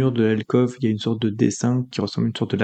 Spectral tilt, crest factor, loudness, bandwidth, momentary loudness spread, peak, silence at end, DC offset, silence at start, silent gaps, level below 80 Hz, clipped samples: -6.5 dB/octave; 16 dB; -22 LUFS; 9 kHz; 4 LU; -4 dBFS; 0 s; under 0.1%; 0 s; none; -62 dBFS; under 0.1%